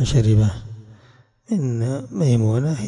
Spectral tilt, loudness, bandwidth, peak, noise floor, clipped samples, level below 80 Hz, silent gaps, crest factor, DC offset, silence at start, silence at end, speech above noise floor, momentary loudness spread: -7.5 dB/octave; -20 LUFS; 10.5 kHz; -6 dBFS; -52 dBFS; under 0.1%; -38 dBFS; none; 14 dB; under 0.1%; 0 s; 0 s; 34 dB; 18 LU